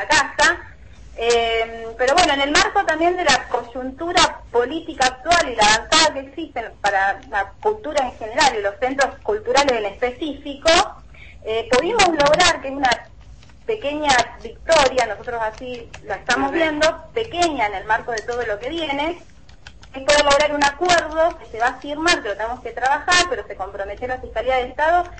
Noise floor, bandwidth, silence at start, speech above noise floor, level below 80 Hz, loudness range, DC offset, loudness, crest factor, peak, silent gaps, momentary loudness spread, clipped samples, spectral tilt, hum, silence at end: -44 dBFS; 8.8 kHz; 0 s; 25 dB; -42 dBFS; 3 LU; 0.4%; -19 LUFS; 18 dB; -2 dBFS; none; 12 LU; under 0.1%; -2 dB/octave; none; 0 s